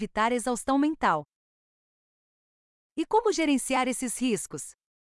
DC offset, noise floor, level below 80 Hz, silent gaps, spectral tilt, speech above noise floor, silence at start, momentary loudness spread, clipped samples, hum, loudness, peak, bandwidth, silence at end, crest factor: under 0.1%; under -90 dBFS; -58 dBFS; 1.36-2.96 s; -3.5 dB/octave; over 63 dB; 0 s; 11 LU; under 0.1%; none; -27 LUFS; -12 dBFS; 12 kHz; 0.4 s; 16 dB